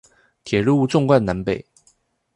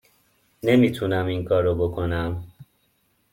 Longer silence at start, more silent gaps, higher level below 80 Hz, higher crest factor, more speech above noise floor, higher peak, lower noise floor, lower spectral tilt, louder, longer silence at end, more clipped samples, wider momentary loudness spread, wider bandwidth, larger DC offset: second, 0.45 s vs 0.65 s; neither; about the same, -48 dBFS vs -48 dBFS; about the same, 18 dB vs 18 dB; about the same, 43 dB vs 45 dB; first, -2 dBFS vs -6 dBFS; second, -61 dBFS vs -67 dBFS; about the same, -7 dB/octave vs -7.5 dB/octave; first, -19 LUFS vs -23 LUFS; about the same, 0.75 s vs 0.7 s; neither; about the same, 9 LU vs 9 LU; second, 11 kHz vs 16.5 kHz; neither